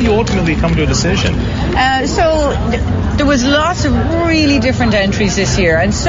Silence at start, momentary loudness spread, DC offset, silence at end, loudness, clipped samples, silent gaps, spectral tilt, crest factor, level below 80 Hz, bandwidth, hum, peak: 0 s; 4 LU; under 0.1%; 0 s; -13 LUFS; under 0.1%; none; -5 dB/octave; 12 dB; -22 dBFS; 7.8 kHz; none; 0 dBFS